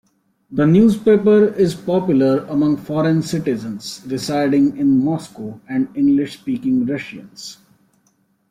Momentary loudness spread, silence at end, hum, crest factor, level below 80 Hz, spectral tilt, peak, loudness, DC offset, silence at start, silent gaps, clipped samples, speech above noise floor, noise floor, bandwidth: 16 LU; 1 s; none; 14 dB; -54 dBFS; -7 dB/octave; -4 dBFS; -17 LUFS; under 0.1%; 0.5 s; none; under 0.1%; 45 dB; -62 dBFS; 14.5 kHz